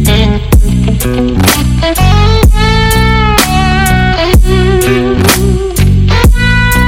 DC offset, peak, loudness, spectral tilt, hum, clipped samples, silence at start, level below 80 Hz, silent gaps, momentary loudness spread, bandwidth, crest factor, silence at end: under 0.1%; 0 dBFS; -8 LUFS; -5 dB/octave; none; 4%; 0 s; -12 dBFS; none; 3 LU; over 20 kHz; 6 dB; 0 s